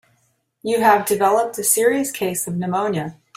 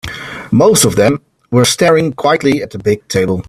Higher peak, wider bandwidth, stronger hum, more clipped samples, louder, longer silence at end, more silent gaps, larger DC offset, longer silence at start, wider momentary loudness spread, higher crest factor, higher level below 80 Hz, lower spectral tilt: about the same, -2 dBFS vs 0 dBFS; about the same, 16 kHz vs 16 kHz; neither; neither; second, -19 LUFS vs -12 LUFS; first, 0.25 s vs 0.05 s; neither; neither; first, 0.65 s vs 0.05 s; about the same, 8 LU vs 8 LU; first, 18 dB vs 12 dB; second, -62 dBFS vs -44 dBFS; about the same, -4 dB/octave vs -4.5 dB/octave